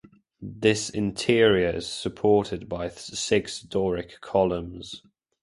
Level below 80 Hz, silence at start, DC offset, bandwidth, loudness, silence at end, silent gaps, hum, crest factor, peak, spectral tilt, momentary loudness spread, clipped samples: -50 dBFS; 0.4 s; under 0.1%; 11.5 kHz; -25 LUFS; 0.45 s; none; none; 22 dB; -4 dBFS; -4.5 dB/octave; 17 LU; under 0.1%